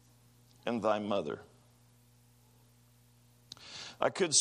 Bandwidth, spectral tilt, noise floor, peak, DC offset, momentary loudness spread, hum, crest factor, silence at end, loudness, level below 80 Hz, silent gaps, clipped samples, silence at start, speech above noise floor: 15 kHz; -2.5 dB/octave; -64 dBFS; -14 dBFS; under 0.1%; 16 LU; 60 Hz at -65 dBFS; 24 dB; 0 s; -34 LUFS; -74 dBFS; none; under 0.1%; 0.65 s; 32 dB